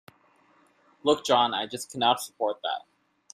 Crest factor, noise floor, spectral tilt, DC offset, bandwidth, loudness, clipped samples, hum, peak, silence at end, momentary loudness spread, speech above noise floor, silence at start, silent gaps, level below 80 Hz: 20 dB; -63 dBFS; -3 dB/octave; under 0.1%; 15.5 kHz; -27 LUFS; under 0.1%; none; -8 dBFS; 0.55 s; 10 LU; 36 dB; 1.05 s; none; -72 dBFS